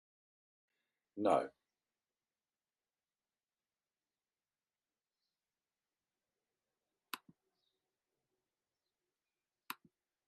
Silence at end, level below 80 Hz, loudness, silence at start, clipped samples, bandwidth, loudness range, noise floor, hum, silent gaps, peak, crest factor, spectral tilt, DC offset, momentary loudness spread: 0.55 s; under -90 dBFS; -37 LUFS; 1.15 s; under 0.1%; 5.4 kHz; 16 LU; under -90 dBFS; none; none; -20 dBFS; 28 dB; -3.5 dB/octave; under 0.1%; 17 LU